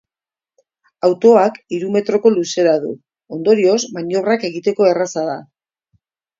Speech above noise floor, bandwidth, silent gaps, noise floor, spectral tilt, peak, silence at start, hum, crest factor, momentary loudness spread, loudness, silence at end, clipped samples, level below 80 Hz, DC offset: over 75 dB; 7.8 kHz; none; under -90 dBFS; -5 dB/octave; 0 dBFS; 1.05 s; none; 16 dB; 12 LU; -16 LUFS; 0.95 s; under 0.1%; -68 dBFS; under 0.1%